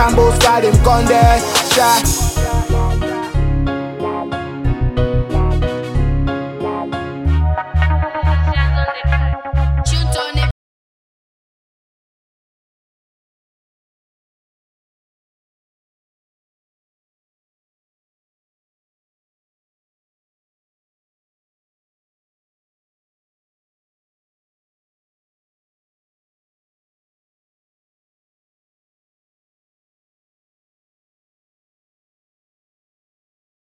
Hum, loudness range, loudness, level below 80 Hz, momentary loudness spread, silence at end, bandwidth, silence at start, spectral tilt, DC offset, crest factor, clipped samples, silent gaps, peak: none; 8 LU; -16 LUFS; -24 dBFS; 10 LU; 23.15 s; 16.5 kHz; 0 s; -5 dB/octave; under 0.1%; 20 dB; under 0.1%; none; 0 dBFS